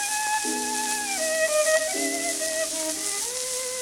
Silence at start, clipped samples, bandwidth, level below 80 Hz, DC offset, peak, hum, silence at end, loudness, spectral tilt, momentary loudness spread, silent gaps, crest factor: 0 s; under 0.1%; 18 kHz; -64 dBFS; under 0.1%; -4 dBFS; none; 0 s; -24 LUFS; 0.5 dB/octave; 5 LU; none; 22 dB